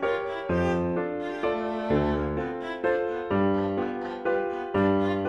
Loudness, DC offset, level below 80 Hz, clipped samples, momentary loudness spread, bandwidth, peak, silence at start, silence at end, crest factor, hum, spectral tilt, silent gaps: -27 LUFS; under 0.1%; -46 dBFS; under 0.1%; 6 LU; 8.4 kHz; -12 dBFS; 0 s; 0 s; 14 dB; none; -8 dB/octave; none